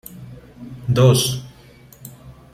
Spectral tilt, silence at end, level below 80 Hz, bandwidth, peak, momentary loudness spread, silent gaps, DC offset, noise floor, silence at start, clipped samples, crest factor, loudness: -5.5 dB/octave; 0.2 s; -48 dBFS; 15.5 kHz; -2 dBFS; 26 LU; none; under 0.1%; -46 dBFS; 0.1 s; under 0.1%; 20 dB; -17 LUFS